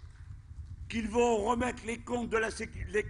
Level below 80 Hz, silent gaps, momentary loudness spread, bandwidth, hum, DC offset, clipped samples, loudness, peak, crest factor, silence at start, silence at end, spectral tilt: -48 dBFS; none; 20 LU; 11 kHz; none; under 0.1%; under 0.1%; -32 LUFS; -16 dBFS; 16 dB; 0 s; 0 s; -5 dB/octave